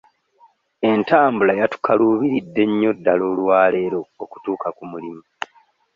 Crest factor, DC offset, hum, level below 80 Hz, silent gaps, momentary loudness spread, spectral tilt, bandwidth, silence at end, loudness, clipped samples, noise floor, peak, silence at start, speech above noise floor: 16 dB; under 0.1%; none; -62 dBFS; none; 17 LU; -7.5 dB/octave; 7.2 kHz; 0.75 s; -18 LUFS; under 0.1%; -57 dBFS; -2 dBFS; 0.8 s; 38 dB